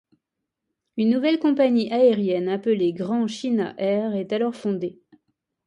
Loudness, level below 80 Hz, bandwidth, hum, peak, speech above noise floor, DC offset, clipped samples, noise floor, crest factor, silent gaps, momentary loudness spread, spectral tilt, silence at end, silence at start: -22 LUFS; -72 dBFS; 10.5 kHz; none; -8 dBFS; 61 dB; under 0.1%; under 0.1%; -82 dBFS; 16 dB; none; 8 LU; -7 dB/octave; 0.75 s; 0.95 s